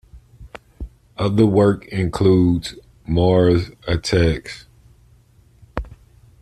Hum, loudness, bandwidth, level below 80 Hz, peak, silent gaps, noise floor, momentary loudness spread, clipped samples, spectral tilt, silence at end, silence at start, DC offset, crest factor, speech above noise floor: none; -18 LUFS; 12 kHz; -38 dBFS; -2 dBFS; none; -52 dBFS; 22 LU; under 0.1%; -7 dB/octave; 0.55 s; 0.15 s; under 0.1%; 18 dB; 35 dB